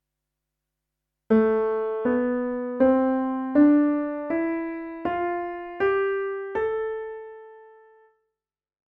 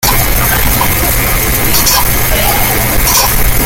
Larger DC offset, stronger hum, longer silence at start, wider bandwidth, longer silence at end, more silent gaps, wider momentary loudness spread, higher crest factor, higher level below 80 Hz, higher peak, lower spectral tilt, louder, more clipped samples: neither; neither; first, 1.3 s vs 0 s; second, 3.9 kHz vs 17.5 kHz; first, 1.3 s vs 0 s; neither; first, 12 LU vs 3 LU; first, 16 dB vs 10 dB; second, -58 dBFS vs -16 dBFS; second, -8 dBFS vs 0 dBFS; first, -9 dB/octave vs -2.5 dB/octave; second, -24 LUFS vs -9 LUFS; neither